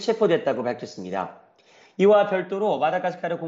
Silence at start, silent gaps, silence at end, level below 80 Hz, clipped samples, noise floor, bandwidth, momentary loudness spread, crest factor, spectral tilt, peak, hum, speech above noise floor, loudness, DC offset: 0 s; none; 0 s; -72 dBFS; under 0.1%; -55 dBFS; 7.8 kHz; 14 LU; 16 dB; -6 dB/octave; -8 dBFS; none; 33 dB; -23 LUFS; under 0.1%